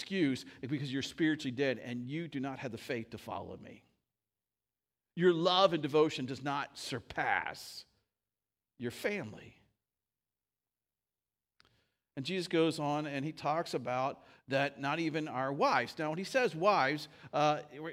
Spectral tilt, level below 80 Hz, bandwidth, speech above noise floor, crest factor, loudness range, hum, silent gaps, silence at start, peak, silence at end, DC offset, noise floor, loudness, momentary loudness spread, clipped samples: -5 dB/octave; -76 dBFS; 16 kHz; over 56 dB; 24 dB; 13 LU; none; none; 0 s; -12 dBFS; 0 s; under 0.1%; under -90 dBFS; -34 LUFS; 14 LU; under 0.1%